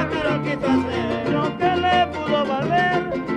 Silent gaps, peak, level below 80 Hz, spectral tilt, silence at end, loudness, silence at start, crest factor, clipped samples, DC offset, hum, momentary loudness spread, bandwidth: none; -8 dBFS; -46 dBFS; -6.5 dB/octave; 0 s; -21 LUFS; 0 s; 14 dB; under 0.1%; under 0.1%; none; 4 LU; 10.5 kHz